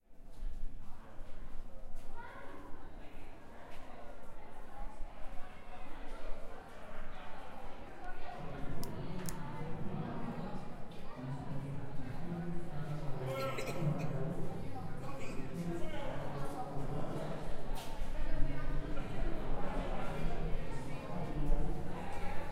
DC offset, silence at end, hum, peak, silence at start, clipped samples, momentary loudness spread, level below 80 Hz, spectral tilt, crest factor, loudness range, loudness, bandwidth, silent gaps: under 0.1%; 0 s; none; -16 dBFS; 0.1 s; under 0.1%; 14 LU; -42 dBFS; -6.5 dB/octave; 18 dB; 12 LU; -44 LUFS; 12 kHz; none